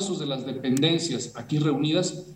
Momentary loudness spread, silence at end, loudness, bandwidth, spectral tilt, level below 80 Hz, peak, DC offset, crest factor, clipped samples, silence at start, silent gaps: 7 LU; 0 s; -25 LUFS; 16 kHz; -5 dB/octave; -66 dBFS; -8 dBFS; under 0.1%; 18 dB; under 0.1%; 0 s; none